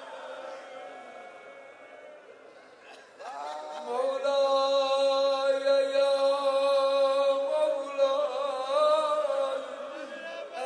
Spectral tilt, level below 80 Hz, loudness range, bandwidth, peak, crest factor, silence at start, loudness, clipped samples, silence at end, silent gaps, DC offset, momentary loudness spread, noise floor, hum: -1 dB/octave; under -90 dBFS; 18 LU; 10.5 kHz; -14 dBFS; 16 dB; 0 s; -27 LUFS; under 0.1%; 0 s; none; under 0.1%; 21 LU; -52 dBFS; none